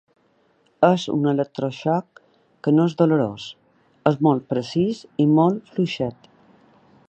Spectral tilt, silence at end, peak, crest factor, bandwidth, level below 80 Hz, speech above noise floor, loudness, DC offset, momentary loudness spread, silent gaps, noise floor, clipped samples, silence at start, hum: -7.5 dB/octave; 0.95 s; -2 dBFS; 20 dB; 8.4 kHz; -62 dBFS; 42 dB; -21 LUFS; under 0.1%; 9 LU; none; -62 dBFS; under 0.1%; 0.8 s; none